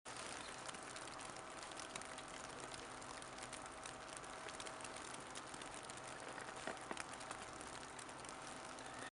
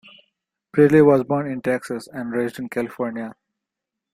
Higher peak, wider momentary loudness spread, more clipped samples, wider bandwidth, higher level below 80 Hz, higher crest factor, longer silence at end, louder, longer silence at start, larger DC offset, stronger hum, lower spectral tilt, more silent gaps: second, -26 dBFS vs -2 dBFS; second, 3 LU vs 16 LU; neither; second, 11.5 kHz vs 14.5 kHz; second, -72 dBFS vs -62 dBFS; first, 24 dB vs 18 dB; second, 0.05 s vs 0.8 s; second, -50 LUFS vs -20 LUFS; second, 0.05 s vs 0.75 s; neither; neither; second, -2 dB/octave vs -8 dB/octave; neither